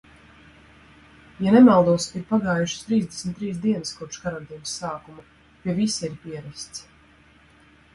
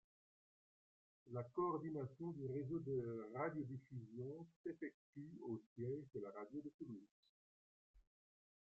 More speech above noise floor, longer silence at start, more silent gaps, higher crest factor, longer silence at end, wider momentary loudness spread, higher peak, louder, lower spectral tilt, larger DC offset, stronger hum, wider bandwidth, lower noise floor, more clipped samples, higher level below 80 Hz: second, 32 dB vs over 42 dB; first, 1.4 s vs 1.25 s; second, none vs 4.56-4.64 s, 4.94-5.13 s, 5.66-5.76 s, 6.74-6.79 s, 7.11-7.23 s, 7.29-7.94 s; about the same, 20 dB vs 18 dB; first, 1.15 s vs 0.6 s; first, 21 LU vs 10 LU; first, -4 dBFS vs -32 dBFS; first, -22 LUFS vs -49 LUFS; second, -5.5 dB/octave vs -9.5 dB/octave; neither; neither; first, 11.5 kHz vs 7.6 kHz; second, -54 dBFS vs under -90 dBFS; neither; first, -56 dBFS vs -82 dBFS